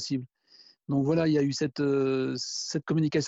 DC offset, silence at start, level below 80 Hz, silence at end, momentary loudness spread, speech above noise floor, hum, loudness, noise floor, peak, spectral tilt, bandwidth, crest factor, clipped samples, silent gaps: under 0.1%; 0 s; -66 dBFS; 0 s; 8 LU; 31 dB; none; -28 LUFS; -58 dBFS; -12 dBFS; -5.5 dB/octave; 8 kHz; 16 dB; under 0.1%; none